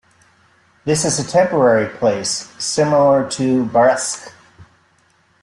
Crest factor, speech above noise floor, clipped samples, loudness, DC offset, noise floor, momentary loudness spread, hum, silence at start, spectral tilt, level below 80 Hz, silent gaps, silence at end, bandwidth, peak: 14 dB; 41 dB; under 0.1%; -16 LUFS; under 0.1%; -57 dBFS; 8 LU; none; 0.85 s; -4 dB/octave; -56 dBFS; none; 0.8 s; 12.5 kHz; -2 dBFS